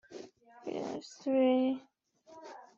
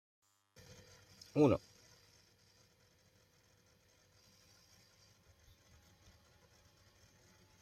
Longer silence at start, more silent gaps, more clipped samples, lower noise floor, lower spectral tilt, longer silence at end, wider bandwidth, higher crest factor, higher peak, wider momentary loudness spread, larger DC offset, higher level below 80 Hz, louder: second, 0.1 s vs 1.35 s; neither; neither; second, -59 dBFS vs -71 dBFS; second, -5.5 dB/octave vs -7.5 dB/octave; second, 0.15 s vs 6.05 s; second, 7.4 kHz vs 14 kHz; second, 16 dB vs 26 dB; about the same, -18 dBFS vs -18 dBFS; second, 23 LU vs 32 LU; neither; second, -82 dBFS vs -72 dBFS; about the same, -33 LUFS vs -34 LUFS